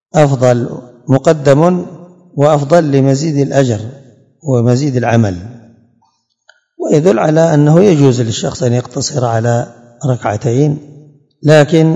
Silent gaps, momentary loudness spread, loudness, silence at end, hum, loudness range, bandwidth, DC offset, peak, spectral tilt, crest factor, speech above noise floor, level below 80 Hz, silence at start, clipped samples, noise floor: none; 15 LU; -11 LUFS; 0 s; none; 4 LU; 9.2 kHz; under 0.1%; 0 dBFS; -6.5 dB/octave; 12 dB; 49 dB; -52 dBFS; 0.15 s; 1%; -59 dBFS